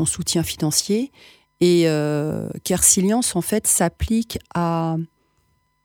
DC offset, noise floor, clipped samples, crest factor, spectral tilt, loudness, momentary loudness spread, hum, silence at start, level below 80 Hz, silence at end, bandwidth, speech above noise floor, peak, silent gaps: under 0.1%; -65 dBFS; under 0.1%; 18 dB; -4 dB/octave; -19 LUFS; 11 LU; none; 0 s; -40 dBFS; 0.8 s; over 20 kHz; 45 dB; -2 dBFS; none